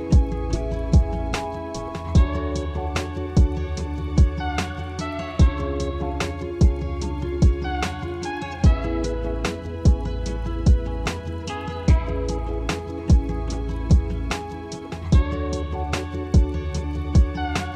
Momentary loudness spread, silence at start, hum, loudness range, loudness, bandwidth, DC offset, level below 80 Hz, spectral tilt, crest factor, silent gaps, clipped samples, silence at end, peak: 8 LU; 0 s; none; 1 LU; -24 LUFS; 10 kHz; under 0.1%; -24 dBFS; -6.5 dB/octave; 16 dB; none; under 0.1%; 0 s; -6 dBFS